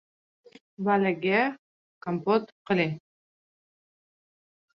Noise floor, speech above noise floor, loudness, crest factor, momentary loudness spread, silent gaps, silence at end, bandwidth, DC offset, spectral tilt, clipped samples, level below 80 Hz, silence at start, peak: under -90 dBFS; over 64 dB; -27 LUFS; 20 dB; 9 LU; 1.59-2.01 s, 2.52-2.65 s; 1.8 s; 6.2 kHz; under 0.1%; -8 dB/octave; under 0.1%; -74 dBFS; 0.8 s; -10 dBFS